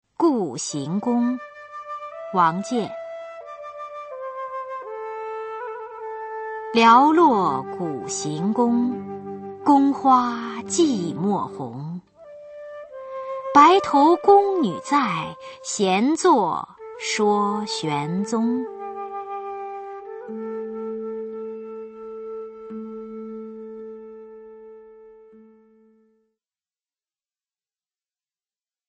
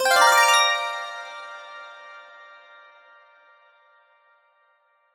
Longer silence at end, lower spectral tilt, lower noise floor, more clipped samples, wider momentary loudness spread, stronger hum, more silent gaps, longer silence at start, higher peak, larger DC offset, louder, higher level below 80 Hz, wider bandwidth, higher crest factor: first, 3.75 s vs 2.95 s; first, -5 dB/octave vs 3 dB/octave; first, under -90 dBFS vs -64 dBFS; neither; second, 20 LU vs 28 LU; neither; neither; first, 0.2 s vs 0 s; about the same, -2 dBFS vs -2 dBFS; neither; second, -21 LUFS vs -18 LUFS; first, -68 dBFS vs -80 dBFS; second, 8.8 kHz vs 17.5 kHz; about the same, 22 dB vs 22 dB